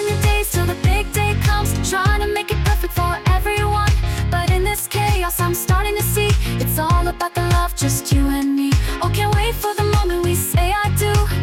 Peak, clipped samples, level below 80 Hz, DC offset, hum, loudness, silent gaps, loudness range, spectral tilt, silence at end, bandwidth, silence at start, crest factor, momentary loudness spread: -6 dBFS; under 0.1%; -22 dBFS; under 0.1%; none; -18 LUFS; none; 0 LU; -5 dB/octave; 0 s; 17.5 kHz; 0 s; 12 dB; 2 LU